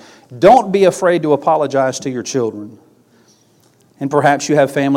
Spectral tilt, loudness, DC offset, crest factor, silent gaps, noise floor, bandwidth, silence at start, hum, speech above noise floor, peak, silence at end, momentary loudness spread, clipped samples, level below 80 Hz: -5.5 dB/octave; -14 LUFS; under 0.1%; 14 dB; none; -53 dBFS; 16 kHz; 0.3 s; none; 39 dB; 0 dBFS; 0 s; 12 LU; under 0.1%; -54 dBFS